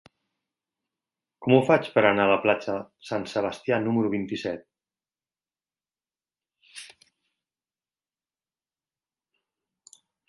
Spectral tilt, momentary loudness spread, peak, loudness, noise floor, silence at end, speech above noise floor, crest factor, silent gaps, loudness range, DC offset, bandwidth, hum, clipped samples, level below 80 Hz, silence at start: -6.5 dB/octave; 15 LU; -4 dBFS; -24 LUFS; under -90 dBFS; 3.45 s; over 66 dB; 26 dB; none; 13 LU; under 0.1%; 11.5 kHz; none; under 0.1%; -66 dBFS; 1.4 s